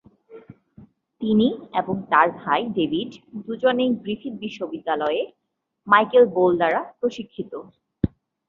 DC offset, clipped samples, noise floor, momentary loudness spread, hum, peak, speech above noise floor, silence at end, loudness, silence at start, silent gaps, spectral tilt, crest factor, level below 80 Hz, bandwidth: under 0.1%; under 0.1%; -53 dBFS; 16 LU; none; -2 dBFS; 31 dB; 0.4 s; -22 LUFS; 0.3 s; none; -7 dB/octave; 22 dB; -52 dBFS; 7 kHz